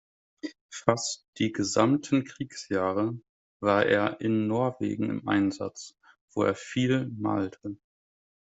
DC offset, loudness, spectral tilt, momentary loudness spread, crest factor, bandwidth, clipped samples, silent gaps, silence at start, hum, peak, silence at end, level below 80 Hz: under 0.1%; -28 LUFS; -5.5 dB/octave; 17 LU; 24 dB; 8.2 kHz; under 0.1%; 0.61-0.69 s, 1.28-1.33 s, 3.29-3.60 s, 6.21-6.28 s; 0.45 s; none; -4 dBFS; 0.85 s; -68 dBFS